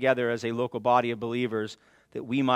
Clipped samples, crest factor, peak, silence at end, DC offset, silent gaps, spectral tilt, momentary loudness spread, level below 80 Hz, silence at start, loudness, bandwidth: under 0.1%; 20 dB; -8 dBFS; 0 s; under 0.1%; none; -6 dB/octave; 14 LU; -72 dBFS; 0 s; -28 LUFS; 12 kHz